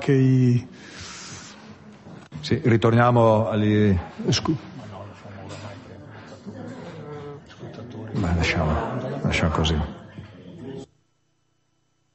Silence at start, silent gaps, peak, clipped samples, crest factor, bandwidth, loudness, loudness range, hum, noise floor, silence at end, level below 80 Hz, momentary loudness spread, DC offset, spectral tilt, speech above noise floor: 0 s; none; -6 dBFS; under 0.1%; 18 dB; 8.4 kHz; -22 LUFS; 13 LU; none; -70 dBFS; 1.3 s; -38 dBFS; 24 LU; under 0.1%; -6.5 dB/octave; 50 dB